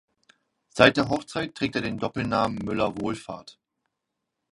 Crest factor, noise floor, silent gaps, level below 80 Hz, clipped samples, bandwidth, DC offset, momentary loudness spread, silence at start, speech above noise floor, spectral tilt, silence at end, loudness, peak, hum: 26 dB; -82 dBFS; none; -54 dBFS; under 0.1%; 11.5 kHz; under 0.1%; 17 LU; 0.75 s; 57 dB; -5.5 dB/octave; 1 s; -25 LUFS; 0 dBFS; none